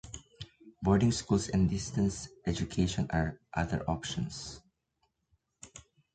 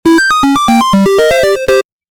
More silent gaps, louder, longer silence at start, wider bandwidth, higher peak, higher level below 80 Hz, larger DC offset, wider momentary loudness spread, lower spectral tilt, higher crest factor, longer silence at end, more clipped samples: neither; second, -32 LUFS vs -9 LUFS; about the same, 0.05 s vs 0.05 s; second, 9.4 kHz vs 19.5 kHz; second, -14 dBFS vs 0 dBFS; second, -48 dBFS vs -36 dBFS; second, under 0.1% vs 0.4%; first, 21 LU vs 4 LU; about the same, -5.5 dB/octave vs -4.5 dB/octave; first, 20 dB vs 8 dB; about the same, 0.35 s vs 0.3 s; neither